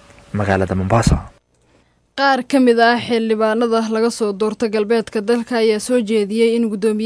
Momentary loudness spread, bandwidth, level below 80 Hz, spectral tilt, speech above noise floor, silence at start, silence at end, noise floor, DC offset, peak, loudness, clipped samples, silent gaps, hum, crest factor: 6 LU; 11 kHz; -36 dBFS; -5.5 dB/octave; 41 dB; 0.35 s; 0 s; -57 dBFS; under 0.1%; 0 dBFS; -17 LUFS; under 0.1%; none; none; 16 dB